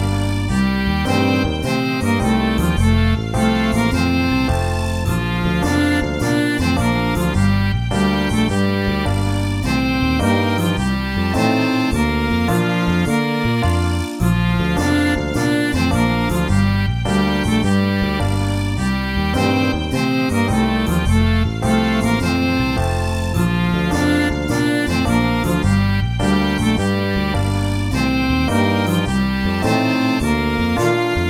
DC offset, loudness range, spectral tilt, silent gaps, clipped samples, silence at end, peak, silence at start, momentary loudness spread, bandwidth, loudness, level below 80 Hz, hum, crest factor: under 0.1%; 1 LU; -6 dB/octave; none; under 0.1%; 0 s; -2 dBFS; 0 s; 3 LU; 16 kHz; -18 LUFS; -28 dBFS; none; 14 dB